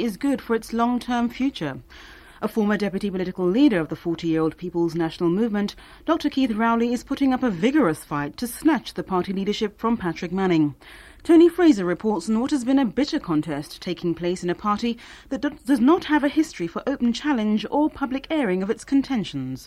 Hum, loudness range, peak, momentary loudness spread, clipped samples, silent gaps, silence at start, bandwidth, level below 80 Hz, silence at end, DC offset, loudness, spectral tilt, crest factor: none; 4 LU; -6 dBFS; 10 LU; under 0.1%; none; 0 s; 14.5 kHz; -50 dBFS; 0 s; under 0.1%; -23 LUFS; -6 dB/octave; 16 dB